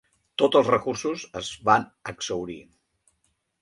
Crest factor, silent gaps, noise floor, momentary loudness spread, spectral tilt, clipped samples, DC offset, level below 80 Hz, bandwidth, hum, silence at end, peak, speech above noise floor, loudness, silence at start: 22 dB; none; -73 dBFS; 16 LU; -4 dB/octave; under 0.1%; under 0.1%; -60 dBFS; 11.5 kHz; none; 1 s; -4 dBFS; 48 dB; -24 LUFS; 0.4 s